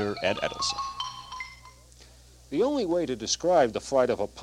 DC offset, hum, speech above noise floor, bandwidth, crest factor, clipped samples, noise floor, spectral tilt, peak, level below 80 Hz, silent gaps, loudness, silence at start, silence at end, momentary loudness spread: under 0.1%; none; 26 dB; 13.5 kHz; 18 dB; under 0.1%; -52 dBFS; -3.5 dB/octave; -10 dBFS; -54 dBFS; none; -27 LUFS; 0 s; 0 s; 14 LU